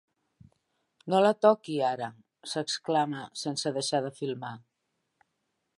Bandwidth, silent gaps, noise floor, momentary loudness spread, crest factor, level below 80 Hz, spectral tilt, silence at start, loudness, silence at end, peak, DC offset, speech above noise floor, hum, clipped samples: 11.5 kHz; none; -80 dBFS; 16 LU; 24 dB; -78 dBFS; -4.5 dB/octave; 1.05 s; -29 LUFS; 1.2 s; -8 dBFS; under 0.1%; 52 dB; none; under 0.1%